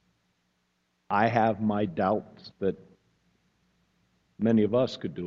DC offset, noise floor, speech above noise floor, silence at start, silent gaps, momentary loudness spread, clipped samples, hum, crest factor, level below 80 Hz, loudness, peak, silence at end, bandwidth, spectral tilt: under 0.1%; -74 dBFS; 48 dB; 1.1 s; none; 9 LU; under 0.1%; none; 20 dB; -64 dBFS; -27 LUFS; -8 dBFS; 0 s; 7.2 kHz; -8 dB/octave